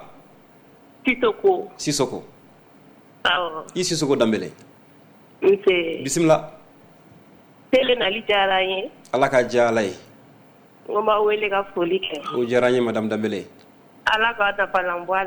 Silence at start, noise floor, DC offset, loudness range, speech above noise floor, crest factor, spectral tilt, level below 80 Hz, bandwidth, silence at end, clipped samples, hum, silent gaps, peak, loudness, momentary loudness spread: 0 s; -51 dBFS; under 0.1%; 3 LU; 30 dB; 18 dB; -4 dB/octave; -56 dBFS; over 20 kHz; 0 s; under 0.1%; none; none; -4 dBFS; -21 LUFS; 8 LU